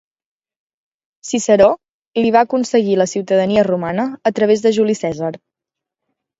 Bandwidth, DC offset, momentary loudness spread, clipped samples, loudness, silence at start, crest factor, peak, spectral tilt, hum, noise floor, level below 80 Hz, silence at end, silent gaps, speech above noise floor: 8 kHz; under 0.1%; 11 LU; under 0.1%; -16 LUFS; 1.25 s; 16 dB; 0 dBFS; -5 dB/octave; none; -84 dBFS; -54 dBFS; 1.05 s; 1.93-2.00 s, 2.07-2.12 s; 69 dB